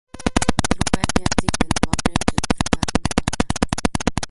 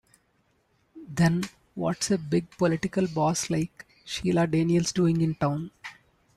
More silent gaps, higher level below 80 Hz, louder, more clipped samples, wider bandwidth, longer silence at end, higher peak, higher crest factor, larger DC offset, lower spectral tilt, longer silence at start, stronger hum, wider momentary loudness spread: neither; first, -32 dBFS vs -56 dBFS; first, -21 LUFS vs -27 LUFS; neither; about the same, 12 kHz vs 13 kHz; second, 0 s vs 0.45 s; first, 0 dBFS vs -10 dBFS; about the same, 20 dB vs 16 dB; neither; second, -4 dB/octave vs -5.5 dB/octave; second, 0.15 s vs 0.95 s; neither; second, 2 LU vs 13 LU